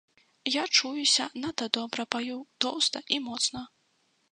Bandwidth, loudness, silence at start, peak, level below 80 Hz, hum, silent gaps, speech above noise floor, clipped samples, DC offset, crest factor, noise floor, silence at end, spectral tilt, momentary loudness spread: 11 kHz; -27 LUFS; 0.45 s; -4 dBFS; -70 dBFS; none; none; 42 dB; under 0.1%; under 0.1%; 26 dB; -71 dBFS; 0.65 s; -0.5 dB/octave; 11 LU